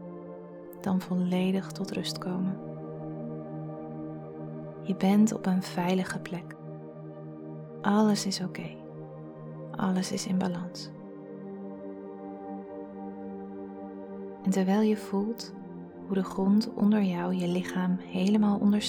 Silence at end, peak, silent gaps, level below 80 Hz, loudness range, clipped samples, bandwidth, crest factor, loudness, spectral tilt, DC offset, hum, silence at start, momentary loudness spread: 0 s; -12 dBFS; none; -68 dBFS; 8 LU; under 0.1%; 15.5 kHz; 18 dB; -30 LUFS; -6 dB/octave; under 0.1%; none; 0 s; 18 LU